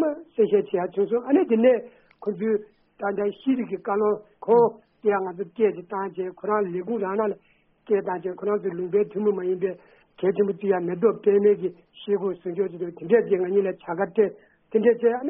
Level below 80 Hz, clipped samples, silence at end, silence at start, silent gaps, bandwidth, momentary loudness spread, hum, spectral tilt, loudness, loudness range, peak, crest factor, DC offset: -70 dBFS; under 0.1%; 0 s; 0 s; none; 3.7 kHz; 10 LU; none; -6.5 dB/octave; -24 LUFS; 3 LU; -8 dBFS; 16 dB; under 0.1%